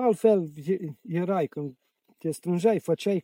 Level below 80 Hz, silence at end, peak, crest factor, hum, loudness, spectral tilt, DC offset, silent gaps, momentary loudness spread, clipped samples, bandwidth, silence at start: -76 dBFS; 0 s; -8 dBFS; 18 dB; none; -27 LUFS; -7 dB/octave; under 0.1%; none; 12 LU; under 0.1%; 16.5 kHz; 0 s